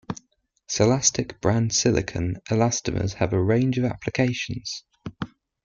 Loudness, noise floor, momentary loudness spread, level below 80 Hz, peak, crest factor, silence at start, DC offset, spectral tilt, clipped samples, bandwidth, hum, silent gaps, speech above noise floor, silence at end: -23 LUFS; -66 dBFS; 15 LU; -48 dBFS; -4 dBFS; 20 dB; 0.1 s; under 0.1%; -4.5 dB/octave; under 0.1%; 9.4 kHz; none; none; 43 dB; 0.4 s